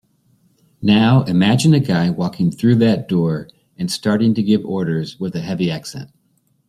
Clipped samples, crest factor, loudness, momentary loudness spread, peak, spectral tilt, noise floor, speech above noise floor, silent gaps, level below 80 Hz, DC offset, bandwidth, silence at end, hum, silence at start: under 0.1%; 14 dB; -17 LUFS; 11 LU; -2 dBFS; -6.5 dB/octave; -62 dBFS; 46 dB; none; -54 dBFS; under 0.1%; 14 kHz; 0.6 s; none; 0.8 s